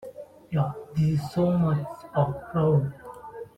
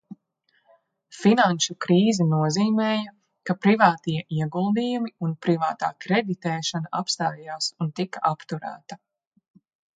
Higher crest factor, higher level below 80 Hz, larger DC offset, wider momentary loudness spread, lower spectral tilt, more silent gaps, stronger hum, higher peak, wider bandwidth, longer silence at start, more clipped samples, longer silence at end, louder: second, 16 dB vs 22 dB; first, -54 dBFS vs -70 dBFS; neither; first, 18 LU vs 12 LU; first, -9 dB/octave vs -5 dB/octave; neither; neither; second, -10 dBFS vs -2 dBFS; about the same, 9.4 kHz vs 9.4 kHz; about the same, 0 s vs 0.1 s; neither; second, 0.1 s vs 1 s; about the same, -26 LUFS vs -24 LUFS